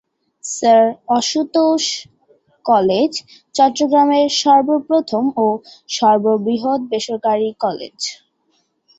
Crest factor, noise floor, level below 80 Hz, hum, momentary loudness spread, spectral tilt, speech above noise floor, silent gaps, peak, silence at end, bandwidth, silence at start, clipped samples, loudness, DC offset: 16 dB; -64 dBFS; -62 dBFS; none; 13 LU; -3.5 dB/octave; 48 dB; none; -2 dBFS; 0.85 s; 8.2 kHz; 0.45 s; under 0.1%; -16 LUFS; under 0.1%